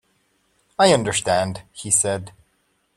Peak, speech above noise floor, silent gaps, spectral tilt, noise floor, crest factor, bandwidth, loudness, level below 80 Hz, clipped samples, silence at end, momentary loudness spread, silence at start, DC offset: -2 dBFS; 47 dB; none; -3 dB/octave; -67 dBFS; 20 dB; 16 kHz; -19 LUFS; -56 dBFS; under 0.1%; 0.65 s; 14 LU; 0.8 s; under 0.1%